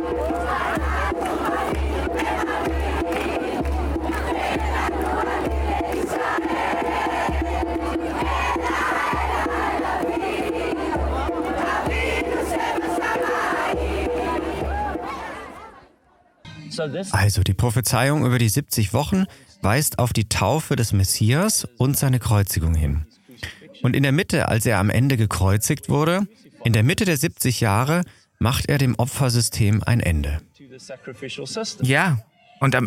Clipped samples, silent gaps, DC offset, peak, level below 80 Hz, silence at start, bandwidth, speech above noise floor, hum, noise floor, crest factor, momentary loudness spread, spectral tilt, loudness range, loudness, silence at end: under 0.1%; none; under 0.1%; -2 dBFS; -34 dBFS; 0 s; 17 kHz; 38 dB; none; -58 dBFS; 20 dB; 8 LU; -5 dB/octave; 4 LU; -22 LUFS; 0 s